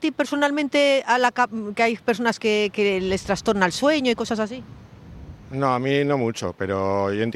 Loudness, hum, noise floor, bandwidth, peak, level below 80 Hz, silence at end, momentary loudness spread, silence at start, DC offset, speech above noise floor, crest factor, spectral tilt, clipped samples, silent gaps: -22 LUFS; none; -41 dBFS; 13.5 kHz; -4 dBFS; -52 dBFS; 0 s; 8 LU; 0 s; under 0.1%; 20 dB; 20 dB; -5 dB/octave; under 0.1%; none